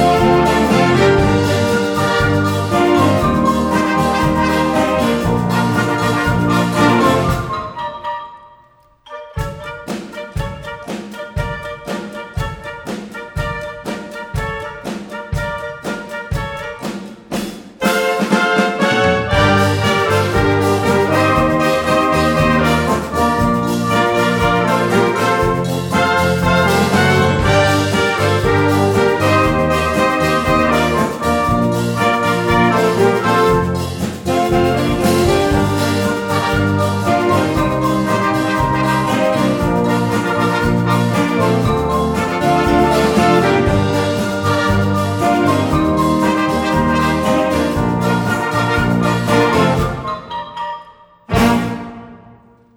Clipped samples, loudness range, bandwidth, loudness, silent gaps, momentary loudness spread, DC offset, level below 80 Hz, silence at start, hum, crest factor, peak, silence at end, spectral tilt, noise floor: under 0.1%; 11 LU; 18.5 kHz; -15 LUFS; none; 13 LU; under 0.1%; -32 dBFS; 0 s; none; 14 dB; 0 dBFS; 0.6 s; -6 dB/octave; -49 dBFS